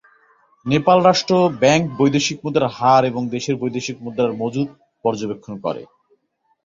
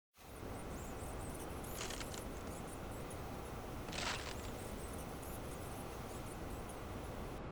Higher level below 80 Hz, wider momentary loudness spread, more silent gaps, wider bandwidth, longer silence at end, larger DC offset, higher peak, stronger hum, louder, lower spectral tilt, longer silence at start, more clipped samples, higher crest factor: about the same, -56 dBFS vs -52 dBFS; first, 12 LU vs 5 LU; neither; second, 7.6 kHz vs over 20 kHz; first, 0.8 s vs 0 s; neither; first, -2 dBFS vs -30 dBFS; neither; first, -18 LUFS vs -46 LUFS; about the same, -5 dB/octave vs -4 dB/octave; first, 0.65 s vs 0.15 s; neither; about the same, 18 dB vs 16 dB